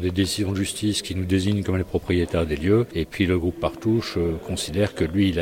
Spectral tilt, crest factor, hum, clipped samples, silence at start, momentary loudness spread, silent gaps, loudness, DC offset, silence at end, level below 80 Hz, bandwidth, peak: -5.5 dB/octave; 16 dB; none; under 0.1%; 0 s; 5 LU; none; -24 LUFS; under 0.1%; 0 s; -40 dBFS; 16.5 kHz; -6 dBFS